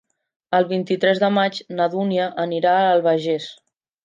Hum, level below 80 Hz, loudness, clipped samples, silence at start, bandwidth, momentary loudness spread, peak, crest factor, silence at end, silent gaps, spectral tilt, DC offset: none; -74 dBFS; -20 LUFS; under 0.1%; 0.5 s; 9 kHz; 6 LU; -4 dBFS; 16 dB; 0.5 s; none; -6.5 dB/octave; under 0.1%